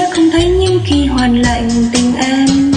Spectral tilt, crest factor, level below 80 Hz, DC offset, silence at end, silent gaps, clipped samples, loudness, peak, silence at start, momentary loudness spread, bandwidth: -5 dB/octave; 10 dB; -24 dBFS; under 0.1%; 0 s; none; under 0.1%; -12 LUFS; 0 dBFS; 0 s; 2 LU; 10.5 kHz